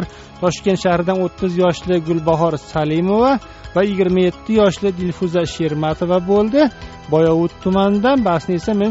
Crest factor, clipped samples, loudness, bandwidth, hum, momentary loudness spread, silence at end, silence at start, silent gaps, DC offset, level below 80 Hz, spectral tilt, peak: 14 dB; under 0.1%; -17 LUFS; 8 kHz; none; 6 LU; 0 s; 0 s; none; under 0.1%; -40 dBFS; -6 dB/octave; -2 dBFS